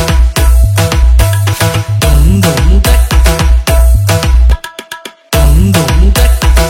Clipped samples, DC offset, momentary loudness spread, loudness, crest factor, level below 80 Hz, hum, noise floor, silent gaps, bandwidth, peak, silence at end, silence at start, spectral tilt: 1%; under 0.1%; 4 LU; -9 LUFS; 6 dB; -8 dBFS; none; -28 dBFS; none; 17 kHz; 0 dBFS; 0 s; 0 s; -5 dB/octave